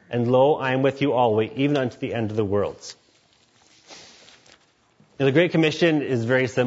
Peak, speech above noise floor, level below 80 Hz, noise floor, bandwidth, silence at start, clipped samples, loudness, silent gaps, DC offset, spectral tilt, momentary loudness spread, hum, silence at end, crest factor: -6 dBFS; 39 dB; -64 dBFS; -60 dBFS; 8 kHz; 0.1 s; under 0.1%; -21 LUFS; none; under 0.1%; -6.5 dB/octave; 8 LU; none; 0 s; 18 dB